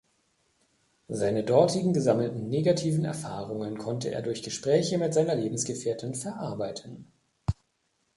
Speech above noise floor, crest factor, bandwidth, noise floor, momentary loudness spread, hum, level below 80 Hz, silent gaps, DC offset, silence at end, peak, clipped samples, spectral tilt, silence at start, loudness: 47 dB; 20 dB; 11.5 kHz; -74 dBFS; 11 LU; none; -54 dBFS; none; under 0.1%; 0.65 s; -8 dBFS; under 0.1%; -6 dB/octave; 1.1 s; -28 LUFS